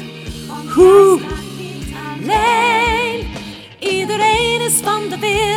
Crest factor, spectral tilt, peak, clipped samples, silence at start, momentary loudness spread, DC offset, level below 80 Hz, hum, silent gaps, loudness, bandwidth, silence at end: 16 dB; -3.5 dB/octave; 0 dBFS; under 0.1%; 0 s; 19 LU; under 0.1%; -36 dBFS; none; none; -14 LUFS; 17.5 kHz; 0 s